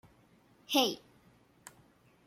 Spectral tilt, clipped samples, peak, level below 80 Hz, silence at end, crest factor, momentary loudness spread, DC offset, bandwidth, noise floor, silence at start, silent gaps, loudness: -2 dB/octave; under 0.1%; -14 dBFS; -78 dBFS; 1.3 s; 24 dB; 26 LU; under 0.1%; 16.5 kHz; -65 dBFS; 0.7 s; none; -31 LUFS